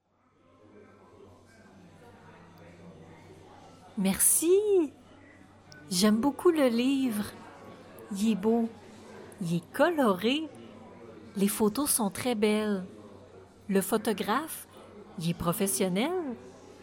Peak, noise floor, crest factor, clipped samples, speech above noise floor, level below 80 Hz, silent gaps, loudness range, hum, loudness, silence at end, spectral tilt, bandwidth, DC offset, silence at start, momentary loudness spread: -10 dBFS; -66 dBFS; 20 dB; under 0.1%; 39 dB; -62 dBFS; none; 5 LU; none; -28 LUFS; 0 s; -4 dB/octave; 17 kHz; under 0.1%; 2.3 s; 25 LU